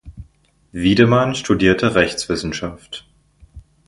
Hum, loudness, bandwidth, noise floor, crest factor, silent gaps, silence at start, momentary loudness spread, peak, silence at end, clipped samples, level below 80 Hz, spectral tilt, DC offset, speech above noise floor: none; -17 LUFS; 11.5 kHz; -55 dBFS; 18 dB; none; 0.05 s; 20 LU; 0 dBFS; 0.25 s; under 0.1%; -40 dBFS; -5.5 dB/octave; under 0.1%; 39 dB